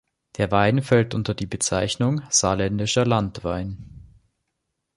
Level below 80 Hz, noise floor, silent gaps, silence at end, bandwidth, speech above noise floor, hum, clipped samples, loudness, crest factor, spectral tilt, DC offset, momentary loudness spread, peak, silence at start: -46 dBFS; -78 dBFS; none; 0.95 s; 11.5 kHz; 56 dB; none; under 0.1%; -22 LUFS; 20 dB; -4.5 dB/octave; under 0.1%; 10 LU; -4 dBFS; 0.4 s